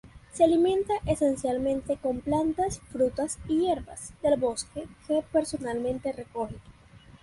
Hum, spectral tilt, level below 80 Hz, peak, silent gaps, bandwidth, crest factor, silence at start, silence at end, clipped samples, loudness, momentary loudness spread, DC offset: none; -5.5 dB/octave; -50 dBFS; -10 dBFS; none; 11.5 kHz; 18 dB; 0.05 s; 0.05 s; under 0.1%; -28 LUFS; 11 LU; under 0.1%